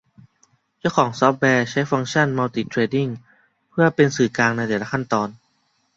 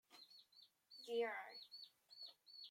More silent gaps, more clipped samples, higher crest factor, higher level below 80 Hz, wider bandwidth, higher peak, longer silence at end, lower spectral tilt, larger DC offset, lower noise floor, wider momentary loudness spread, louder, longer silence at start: neither; neither; about the same, 20 dB vs 20 dB; first, -60 dBFS vs under -90 dBFS; second, 8 kHz vs 16.5 kHz; first, -2 dBFS vs -32 dBFS; first, 0.6 s vs 0 s; first, -5.5 dB/octave vs -2 dB/octave; neither; second, -66 dBFS vs -72 dBFS; second, 8 LU vs 20 LU; first, -20 LUFS vs -50 LUFS; first, 0.85 s vs 0.1 s